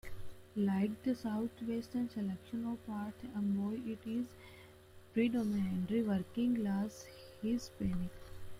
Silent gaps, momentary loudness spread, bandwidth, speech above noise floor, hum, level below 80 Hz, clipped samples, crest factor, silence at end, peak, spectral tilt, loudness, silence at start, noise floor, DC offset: none; 13 LU; 16 kHz; 21 dB; none; -58 dBFS; under 0.1%; 16 dB; 0 s; -22 dBFS; -7.5 dB/octave; -38 LUFS; 0.05 s; -58 dBFS; under 0.1%